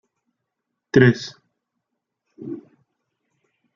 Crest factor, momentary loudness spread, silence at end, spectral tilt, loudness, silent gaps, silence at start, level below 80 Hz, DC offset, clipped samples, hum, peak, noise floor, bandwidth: 22 dB; 22 LU; 1.2 s; -7 dB/octave; -18 LUFS; none; 0.95 s; -64 dBFS; under 0.1%; under 0.1%; none; -2 dBFS; -80 dBFS; 7.4 kHz